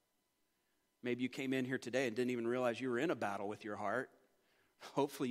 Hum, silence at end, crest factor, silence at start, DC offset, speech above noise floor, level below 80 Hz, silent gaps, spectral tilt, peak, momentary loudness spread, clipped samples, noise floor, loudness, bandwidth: none; 0 s; 20 dB; 1.05 s; under 0.1%; 43 dB; -90 dBFS; none; -5.5 dB/octave; -22 dBFS; 7 LU; under 0.1%; -82 dBFS; -39 LUFS; 16 kHz